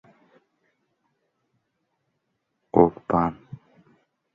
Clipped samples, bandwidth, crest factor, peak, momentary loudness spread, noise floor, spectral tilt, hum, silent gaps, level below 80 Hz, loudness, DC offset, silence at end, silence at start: under 0.1%; 5.2 kHz; 26 dB; -2 dBFS; 10 LU; -77 dBFS; -11 dB/octave; none; none; -54 dBFS; -22 LUFS; under 0.1%; 1 s; 2.75 s